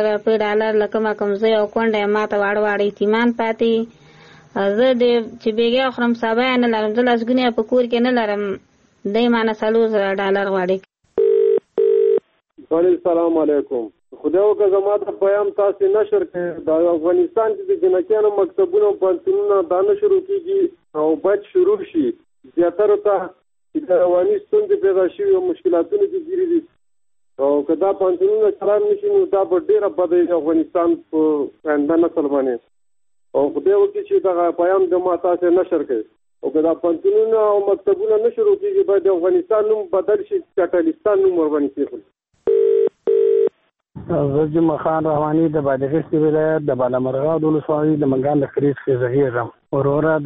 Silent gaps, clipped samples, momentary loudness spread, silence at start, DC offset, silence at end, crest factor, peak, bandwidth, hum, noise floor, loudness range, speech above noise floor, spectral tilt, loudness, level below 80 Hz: none; under 0.1%; 6 LU; 0 s; under 0.1%; 0 s; 12 dB; -6 dBFS; 5.2 kHz; none; -81 dBFS; 2 LU; 64 dB; -8.5 dB/octave; -18 LUFS; -58 dBFS